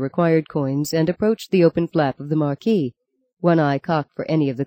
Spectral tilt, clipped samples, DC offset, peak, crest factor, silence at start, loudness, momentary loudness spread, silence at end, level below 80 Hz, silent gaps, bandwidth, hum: -7.5 dB/octave; under 0.1%; under 0.1%; -4 dBFS; 16 dB; 0 s; -20 LUFS; 6 LU; 0 s; -58 dBFS; 3.33-3.37 s; 17 kHz; none